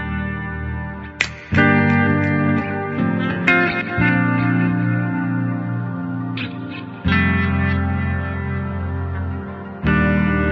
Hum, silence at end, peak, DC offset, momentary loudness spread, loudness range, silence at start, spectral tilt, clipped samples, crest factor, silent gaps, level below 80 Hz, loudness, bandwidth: none; 0 s; 0 dBFS; under 0.1%; 11 LU; 4 LU; 0 s; -7.5 dB/octave; under 0.1%; 20 dB; none; -34 dBFS; -19 LUFS; 8 kHz